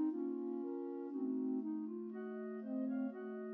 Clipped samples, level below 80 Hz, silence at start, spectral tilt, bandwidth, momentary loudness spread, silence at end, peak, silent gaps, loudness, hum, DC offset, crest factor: under 0.1%; under -90 dBFS; 0 s; -8.5 dB/octave; 3.1 kHz; 6 LU; 0 s; -30 dBFS; none; -42 LUFS; none; under 0.1%; 12 dB